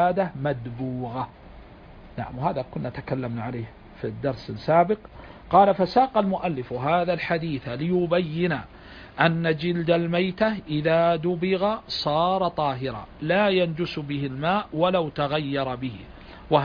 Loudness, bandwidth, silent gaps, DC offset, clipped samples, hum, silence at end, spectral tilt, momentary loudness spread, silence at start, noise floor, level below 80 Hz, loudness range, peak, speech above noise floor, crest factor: -25 LUFS; 5.2 kHz; none; under 0.1%; under 0.1%; none; 0 s; -8 dB/octave; 14 LU; 0 s; -45 dBFS; -50 dBFS; 8 LU; -4 dBFS; 21 dB; 20 dB